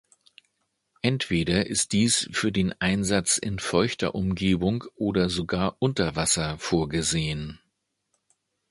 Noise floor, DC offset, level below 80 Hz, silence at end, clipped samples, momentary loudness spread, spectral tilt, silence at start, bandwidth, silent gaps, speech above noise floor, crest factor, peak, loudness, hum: -77 dBFS; under 0.1%; -46 dBFS; 1.15 s; under 0.1%; 5 LU; -4 dB/octave; 1.05 s; 11.5 kHz; none; 52 dB; 20 dB; -6 dBFS; -25 LUFS; none